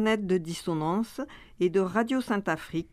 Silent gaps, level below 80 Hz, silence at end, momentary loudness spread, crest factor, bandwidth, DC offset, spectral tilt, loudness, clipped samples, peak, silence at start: none; -58 dBFS; 0.05 s; 8 LU; 18 dB; 15 kHz; under 0.1%; -6 dB/octave; -28 LUFS; under 0.1%; -12 dBFS; 0 s